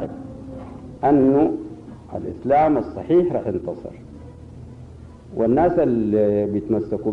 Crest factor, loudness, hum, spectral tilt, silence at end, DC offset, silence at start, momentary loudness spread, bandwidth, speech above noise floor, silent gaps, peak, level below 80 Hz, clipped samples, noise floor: 14 dB; -20 LUFS; none; -10 dB/octave; 0 s; under 0.1%; 0 s; 23 LU; 6 kHz; 21 dB; none; -6 dBFS; -48 dBFS; under 0.1%; -40 dBFS